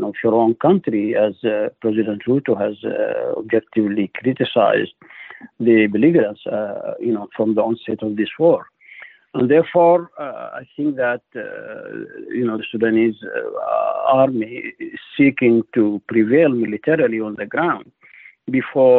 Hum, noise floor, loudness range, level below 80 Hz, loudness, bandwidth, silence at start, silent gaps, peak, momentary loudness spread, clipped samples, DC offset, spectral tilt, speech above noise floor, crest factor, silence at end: none; -46 dBFS; 4 LU; -64 dBFS; -18 LUFS; 4.1 kHz; 0 s; none; -4 dBFS; 15 LU; under 0.1%; under 0.1%; -10 dB/octave; 28 dB; 14 dB; 0 s